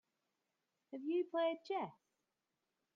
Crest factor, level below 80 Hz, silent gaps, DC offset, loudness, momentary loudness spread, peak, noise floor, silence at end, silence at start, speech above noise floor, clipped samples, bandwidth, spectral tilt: 16 dB; under -90 dBFS; none; under 0.1%; -41 LUFS; 11 LU; -28 dBFS; -89 dBFS; 1.05 s; 0.9 s; 49 dB; under 0.1%; 7.4 kHz; -6.5 dB/octave